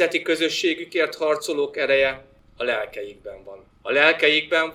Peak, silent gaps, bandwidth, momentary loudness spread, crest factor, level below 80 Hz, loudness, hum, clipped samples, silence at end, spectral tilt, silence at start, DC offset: -2 dBFS; none; 16 kHz; 19 LU; 20 dB; -58 dBFS; -21 LUFS; none; under 0.1%; 0 s; -2.5 dB/octave; 0 s; under 0.1%